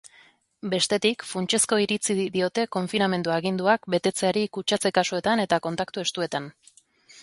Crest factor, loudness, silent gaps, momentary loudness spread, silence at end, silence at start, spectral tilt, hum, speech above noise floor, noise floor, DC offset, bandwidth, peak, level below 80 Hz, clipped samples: 18 dB; -24 LUFS; none; 7 LU; 0 s; 0.05 s; -3.5 dB/octave; none; 33 dB; -57 dBFS; under 0.1%; 12 kHz; -6 dBFS; -66 dBFS; under 0.1%